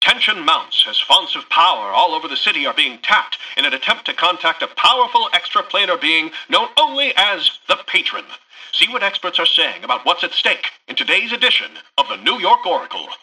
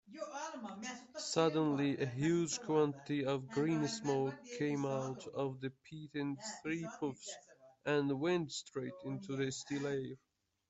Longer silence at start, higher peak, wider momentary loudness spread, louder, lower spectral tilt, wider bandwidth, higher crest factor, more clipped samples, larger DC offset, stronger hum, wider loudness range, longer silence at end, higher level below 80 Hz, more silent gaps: about the same, 0 s vs 0.1 s; first, 0 dBFS vs -18 dBFS; second, 6 LU vs 12 LU; first, -15 LUFS vs -38 LUFS; second, -0.5 dB/octave vs -5 dB/octave; first, 12 kHz vs 8.2 kHz; about the same, 16 dB vs 20 dB; neither; neither; neither; second, 2 LU vs 6 LU; second, 0.05 s vs 0.55 s; first, -64 dBFS vs -76 dBFS; neither